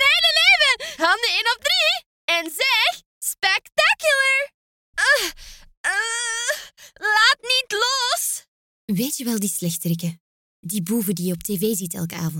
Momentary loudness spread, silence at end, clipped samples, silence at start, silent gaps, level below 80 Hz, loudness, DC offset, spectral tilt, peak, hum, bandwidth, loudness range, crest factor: 12 LU; 0 s; under 0.1%; 0 s; 2.06-2.28 s, 3.06-3.21 s, 4.54-4.93 s, 5.77-5.84 s, 8.48-8.88 s, 10.20-10.63 s; -56 dBFS; -19 LUFS; under 0.1%; -2 dB/octave; -4 dBFS; none; 17 kHz; 6 LU; 18 dB